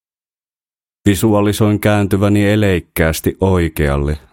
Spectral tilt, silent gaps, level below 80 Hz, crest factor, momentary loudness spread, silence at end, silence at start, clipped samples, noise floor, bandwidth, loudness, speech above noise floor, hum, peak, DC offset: -6.5 dB/octave; none; -30 dBFS; 14 dB; 4 LU; 0.15 s; 1.05 s; under 0.1%; under -90 dBFS; 17 kHz; -15 LUFS; over 76 dB; none; 0 dBFS; under 0.1%